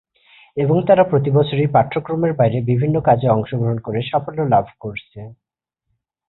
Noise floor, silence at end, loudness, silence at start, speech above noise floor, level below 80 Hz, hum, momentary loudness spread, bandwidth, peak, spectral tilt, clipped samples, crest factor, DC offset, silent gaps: -76 dBFS; 0.95 s; -17 LUFS; 0.55 s; 59 dB; -50 dBFS; none; 16 LU; 4.1 kHz; -2 dBFS; -13 dB/octave; under 0.1%; 16 dB; under 0.1%; none